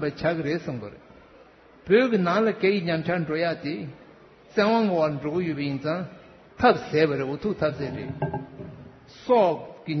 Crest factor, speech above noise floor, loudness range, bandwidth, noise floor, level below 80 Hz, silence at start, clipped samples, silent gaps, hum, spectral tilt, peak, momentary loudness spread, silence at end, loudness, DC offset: 20 dB; 28 dB; 2 LU; 6.4 kHz; -52 dBFS; -58 dBFS; 0 s; under 0.1%; none; none; -7.5 dB/octave; -6 dBFS; 15 LU; 0 s; -25 LUFS; under 0.1%